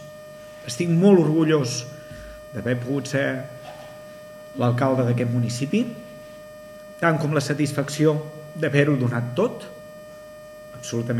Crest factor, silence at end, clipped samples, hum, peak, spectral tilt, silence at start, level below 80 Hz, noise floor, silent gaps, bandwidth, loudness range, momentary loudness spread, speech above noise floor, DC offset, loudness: 20 dB; 0 s; under 0.1%; none; -2 dBFS; -6.5 dB/octave; 0 s; -58 dBFS; -41 dBFS; none; 16 kHz; 4 LU; 22 LU; 20 dB; under 0.1%; -22 LUFS